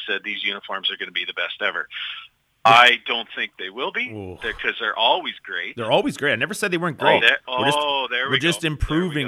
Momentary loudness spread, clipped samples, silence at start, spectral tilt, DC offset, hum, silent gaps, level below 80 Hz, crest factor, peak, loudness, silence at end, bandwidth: 13 LU; under 0.1%; 0 s; -3.5 dB/octave; under 0.1%; none; none; -42 dBFS; 20 dB; -2 dBFS; -20 LUFS; 0 s; 16 kHz